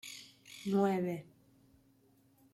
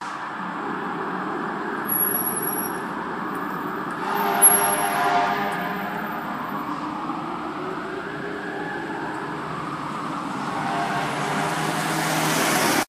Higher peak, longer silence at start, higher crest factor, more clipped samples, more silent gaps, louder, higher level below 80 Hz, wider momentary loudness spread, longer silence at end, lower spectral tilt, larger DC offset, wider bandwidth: second, -20 dBFS vs -4 dBFS; about the same, 0.05 s vs 0 s; about the same, 18 dB vs 22 dB; neither; neither; second, -35 LUFS vs -24 LUFS; second, -78 dBFS vs -60 dBFS; first, 19 LU vs 10 LU; first, 1.3 s vs 0.05 s; first, -6.5 dB/octave vs -2.5 dB/octave; neither; about the same, 14.5 kHz vs 15.5 kHz